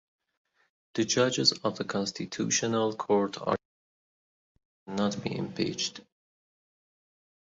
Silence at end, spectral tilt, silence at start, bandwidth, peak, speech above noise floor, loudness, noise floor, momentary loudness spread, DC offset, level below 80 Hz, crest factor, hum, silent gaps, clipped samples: 1.6 s; -3.5 dB/octave; 0.95 s; 8 kHz; -10 dBFS; over 61 dB; -29 LUFS; under -90 dBFS; 9 LU; under 0.1%; -68 dBFS; 22 dB; none; 3.65-4.55 s, 4.65-4.86 s; under 0.1%